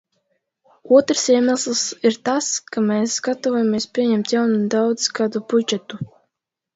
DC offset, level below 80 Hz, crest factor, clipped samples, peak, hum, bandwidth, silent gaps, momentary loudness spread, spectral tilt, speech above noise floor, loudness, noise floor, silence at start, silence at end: under 0.1%; -66 dBFS; 18 dB; under 0.1%; -2 dBFS; none; 8 kHz; none; 7 LU; -3.5 dB/octave; 61 dB; -19 LUFS; -80 dBFS; 0.85 s; 0.7 s